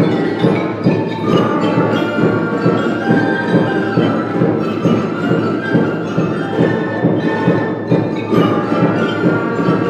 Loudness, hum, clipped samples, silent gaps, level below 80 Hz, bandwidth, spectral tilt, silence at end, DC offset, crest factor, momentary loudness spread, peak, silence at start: -15 LUFS; none; under 0.1%; none; -52 dBFS; 9 kHz; -8 dB/octave; 0 s; under 0.1%; 14 dB; 2 LU; 0 dBFS; 0 s